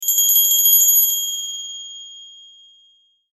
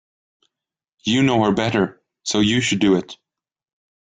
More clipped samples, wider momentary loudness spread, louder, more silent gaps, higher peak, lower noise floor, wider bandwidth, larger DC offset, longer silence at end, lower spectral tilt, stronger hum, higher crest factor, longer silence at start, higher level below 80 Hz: neither; first, 21 LU vs 10 LU; first, -12 LUFS vs -19 LUFS; neither; first, -2 dBFS vs -6 dBFS; second, -57 dBFS vs -75 dBFS; first, 16 kHz vs 9.6 kHz; neither; about the same, 1.05 s vs 0.95 s; second, 6.5 dB/octave vs -4.5 dB/octave; neither; about the same, 18 dB vs 16 dB; second, 0 s vs 1.05 s; second, -64 dBFS vs -54 dBFS